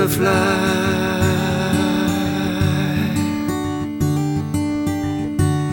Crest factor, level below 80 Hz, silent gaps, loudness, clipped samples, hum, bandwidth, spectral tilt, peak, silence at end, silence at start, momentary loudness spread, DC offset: 14 dB; -40 dBFS; none; -19 LUFS; under 0.1%; none; 19 kHz; -6 dB/octave; -4 dBFS; 0 s; 0 s; 6 LU; under 0.1%